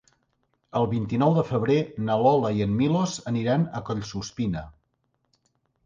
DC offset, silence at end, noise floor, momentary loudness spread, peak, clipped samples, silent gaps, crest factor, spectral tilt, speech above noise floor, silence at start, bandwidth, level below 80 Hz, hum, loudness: under 0.1%; 1.15 s; -74 dBFS; 10 LU; -8 dBFS; under 0.1%; none; 18 dB; -7 dB/octave; 50 dB; 0.75 s; 9.6 kHz; -52 dBFS; none; -25 LUFS